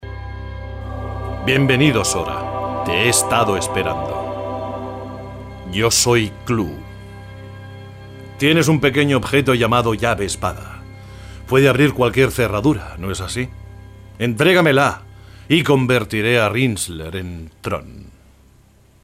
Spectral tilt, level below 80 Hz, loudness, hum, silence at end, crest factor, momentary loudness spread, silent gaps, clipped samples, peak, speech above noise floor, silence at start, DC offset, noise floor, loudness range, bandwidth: -4.5 dB/octave; -38 dBFS; -17 LUFS; none; 0.95 s; 18 dB; 22 LU; none; under 0.1%; -2 dBFS; 34 dB; 0 s; under 0.1%; -51 dBFS; 4 LU; 16 kHz